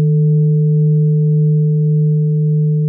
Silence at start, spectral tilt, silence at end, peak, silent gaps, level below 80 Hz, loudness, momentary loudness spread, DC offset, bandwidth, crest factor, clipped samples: 0 s; -19 dB/octave; 0 s; -6 dBFS; none; -72 dBFS; -13 LUFS; 2 LU; under 0.1%; 0.5 kHz; 6 dB; under 0.1%